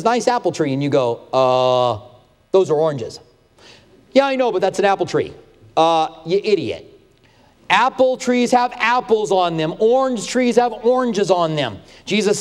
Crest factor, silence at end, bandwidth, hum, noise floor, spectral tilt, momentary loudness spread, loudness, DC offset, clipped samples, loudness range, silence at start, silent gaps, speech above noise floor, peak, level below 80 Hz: 18 dB; 0 s; 12.5 kHz; none; -52 dBFS; -5 dB/octave; 7 LU; -17 LUFS; under 0.1%; under 0.1%; 3 LU; 0 s; none; 35 dB; 0 dBFS; -56 dBFS